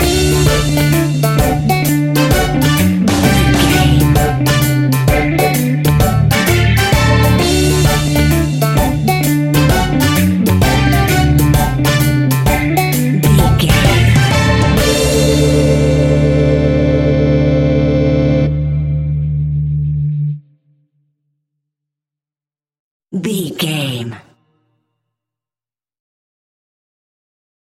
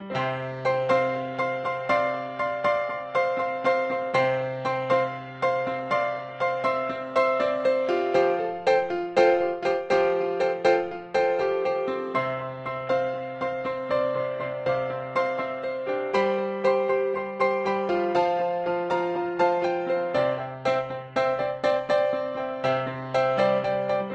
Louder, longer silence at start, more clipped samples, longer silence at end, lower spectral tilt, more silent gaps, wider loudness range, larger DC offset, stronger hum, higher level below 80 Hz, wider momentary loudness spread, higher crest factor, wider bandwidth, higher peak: first, -12 LUFS vs -25 LUFS; about the same, 0 s vs 0 s; neither; first, 3.5 s vs 0 s; about the same, -5.5 dB/octave vs -6 dB/octave; first, 22.79-23.00 s vs none; first, 12 LU vs 4 LU; neither; neither; first, -22 dBFS vs -64 dBFS; about the same, 6 LU vs 6 LU; second, 12 dB vs 20 dB; first, 17 kHz vs 8.4 kHz; first, 0 dBFS vs -6 dBFS